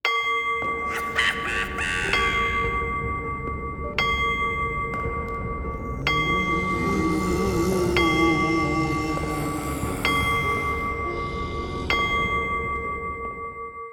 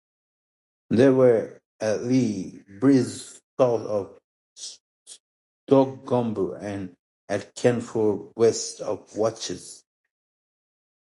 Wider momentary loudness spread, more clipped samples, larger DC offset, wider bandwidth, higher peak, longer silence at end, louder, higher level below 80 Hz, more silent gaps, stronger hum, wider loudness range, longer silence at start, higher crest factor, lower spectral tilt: second, 9 LU vs 18 LU; neither; neither; first, over 20 kHz vs 11.5 kHz; about the same, -6 dBFS vs -4 dBFS; second, 0 s vs 1.4 s; about the same, -24 LUFS vs -24 LUFS; first, -36 dBFS vs -62 dBFS; second, none vs 1.65-1.79 s, 3.43-3.57 s, 4.24-4.56 s, 4.80-5.06 s, 5.20-5.67 s, 6.99-7.28 s; neither; about the same, 3 LU vs 5 LU; second, 0.05 s vs 0.9 s; about the same, 18 dB vs 20 dB; about the same, -5 dB/octave vs -6 dB/octave